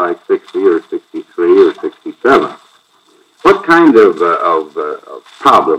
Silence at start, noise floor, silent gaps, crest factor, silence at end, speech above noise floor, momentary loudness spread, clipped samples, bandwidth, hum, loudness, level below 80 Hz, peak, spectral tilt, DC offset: 0 s; -50 dBFS; none; 12 dB; 0 s; 41 dB; 16 LU; 2%; 11 kHz; none; -11 LUFS; -52 dBFS; 0 dBFS; -5.5 dB/octave; under 0.1%